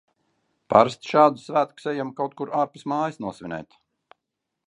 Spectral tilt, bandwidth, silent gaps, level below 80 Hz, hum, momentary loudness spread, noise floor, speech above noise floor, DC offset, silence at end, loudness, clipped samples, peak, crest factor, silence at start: -6 dB/octave; 11 kHz; none; -66 dBFS; none; 15 LU; -82 dBFS; 59 dB; under 0.1%; 1.05 s; -23 LUFS; under 0.1%; -2 dBFS; 24 dB; 0.7 s